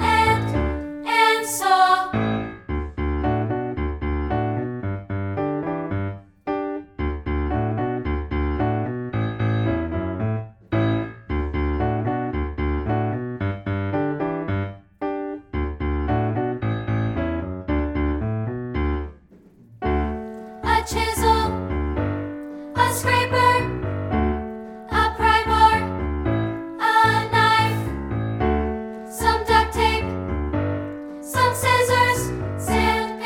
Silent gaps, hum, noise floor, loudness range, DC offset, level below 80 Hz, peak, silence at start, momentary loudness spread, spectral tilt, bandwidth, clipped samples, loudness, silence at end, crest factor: none; none; -50 dBFS; 7 LU; under 0.1%; -32 dBFS; -2 dBFS; 0 s; 12 LU; -5.5 dB/octave; 18 kHz; under 0.1%; -22 LUFS; 0 s; 20 dB